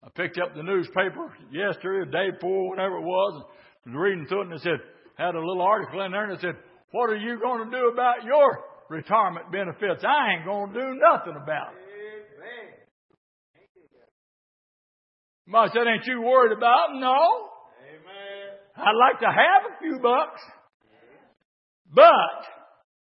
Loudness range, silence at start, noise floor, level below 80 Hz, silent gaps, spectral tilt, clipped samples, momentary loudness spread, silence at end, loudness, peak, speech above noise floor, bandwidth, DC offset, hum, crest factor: 6 LU; 0.2 s; -56 dBFS; -80 dBFS; 6.84-6.88 s, 12.91-13.09 s, 13.17-13.54 s, 13.69-13.75 s, 14.11-15.45 s, 20.74-20.80 s, 21.45-21.85 s; -9 dB/octave; under 0.1%; 20 LU; 0.5 s; -23 LUFS; -2 dBFS; 33 dB; 5.8 kHz; under 0.1%; none; 22 dB